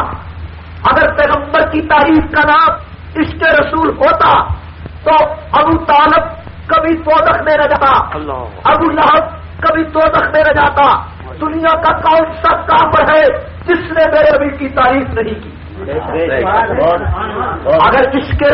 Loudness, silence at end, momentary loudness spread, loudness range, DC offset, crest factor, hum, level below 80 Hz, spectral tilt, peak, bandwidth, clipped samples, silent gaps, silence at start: -11 LUFS; 0 s; 12 LU; 3 LU; under 0.1%; 10 dB; none; -30 dBFS; -3.5 dB/octave; 0 dBFS; 5.8 kHz; under 0.1%; none; 0 s